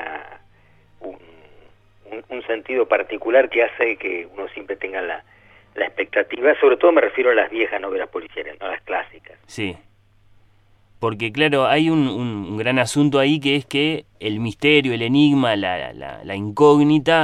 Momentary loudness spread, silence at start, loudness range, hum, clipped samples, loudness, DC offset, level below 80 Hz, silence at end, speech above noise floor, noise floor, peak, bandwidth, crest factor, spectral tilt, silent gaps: 17 LU; 0 s; 8 LU; none; under 0.1%; -19 LUFS; under 0.1%; -58 dBFS; 0 s; 35 dB; -54 dBFS; -2 dBFS; 12 kHz; 18 dB; -5.5 dB/octave; none